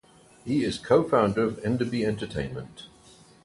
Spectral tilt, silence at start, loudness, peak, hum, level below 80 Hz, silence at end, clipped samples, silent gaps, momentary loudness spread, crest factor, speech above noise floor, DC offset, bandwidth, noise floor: -6.5 dB/octave; 0.45 s; -26 LUFS; -8 dBFS; none; -52 dBFS; 0.55 s; under 0.1%; none; 19 LU; 20 dB; 28 dB; under 0.1%; 11.5 kHz; -54 dBFS